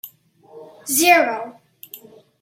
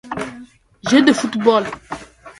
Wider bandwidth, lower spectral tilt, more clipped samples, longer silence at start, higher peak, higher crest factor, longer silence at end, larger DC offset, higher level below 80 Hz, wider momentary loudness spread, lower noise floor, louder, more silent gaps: first, 16.5 kHz vs 11.5 kHz; second, -1 dB/octave vs -4 dB/octave; neither; about the same, 0.05 s vs 0.05 s; about the same, -2 dBFS vs 0 dBFS; about the same, 20 dB vs 18 dB; first, 0.45 s vs 0.1 s; neither; second, -76 dBFS vs -54 dBFS; first, 26 LU vs 19 LU; first, -49 dBFS vs -41 dBFS; about the same, -16 LUFS vs -16 LUFS; neither